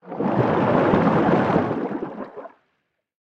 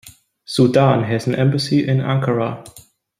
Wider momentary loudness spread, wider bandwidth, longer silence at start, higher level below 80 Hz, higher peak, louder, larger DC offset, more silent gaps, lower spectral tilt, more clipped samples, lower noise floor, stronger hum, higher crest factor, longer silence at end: first, 17 LU vs 10 LU; second, 7.6 kHz vs 15 kHz; about the same, 0.05 s vs 0.05 s; about the same, -52 dBFS vs -56 dBFS; about the same, -2 dBFS vs -2 dBFS; second, -20 LUFS vs -17 LUFS; neither; neither; first, -9 dB/octave vs -7 dB/octave; neither; first, -73 dBFS vs -38 dBFS; neither; about the same, 20 dB vs 16 dB; first, 0.75 s vs 0.4 s